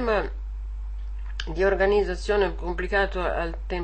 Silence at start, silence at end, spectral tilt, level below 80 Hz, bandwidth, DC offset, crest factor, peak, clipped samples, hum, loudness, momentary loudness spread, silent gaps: 0 s; 0 s; -6 dB/octave; -32 dBFS; 8.6 kHz; 0.4%; 16 dB; -10 dBFS; under 0.1%; none; -25 LUFS; 14 LU; none